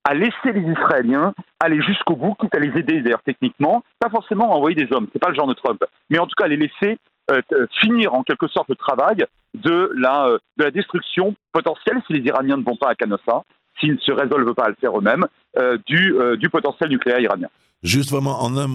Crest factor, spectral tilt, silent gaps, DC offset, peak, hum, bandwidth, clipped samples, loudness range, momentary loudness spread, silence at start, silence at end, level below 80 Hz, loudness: 18 dB; -5.5 dB/octave; none; under 0.1%; 0 dBFS; none; 14.5 kHz; under 0.1%; 2 LU; 6 LU; 0.05 s; 0 s; -62 dBFS; -19 LUFS